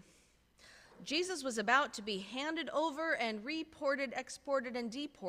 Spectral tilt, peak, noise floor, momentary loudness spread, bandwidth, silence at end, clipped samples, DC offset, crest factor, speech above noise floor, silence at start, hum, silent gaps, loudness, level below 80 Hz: -2.5 dB/octave; -16 dBFS; -68 dBFS; 10 LU; 15.5 kHz; 0 s; under 0.1%; under 0.1%; 22 dB; 31 dB; 0.65 s; none; none; -36 LUFS; -74 dBFS